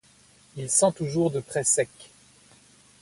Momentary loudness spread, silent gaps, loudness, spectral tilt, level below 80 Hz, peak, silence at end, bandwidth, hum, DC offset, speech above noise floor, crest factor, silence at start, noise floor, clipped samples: 13 LU; none; -24 LUFS; -4 dB/octave; -64 dBFS; -8 dBFS; 0.95 s; 12 kHz; none; under 0.1%; 32 dB; 20 dB; 0.55 s; -57 dBFS; under 0.1%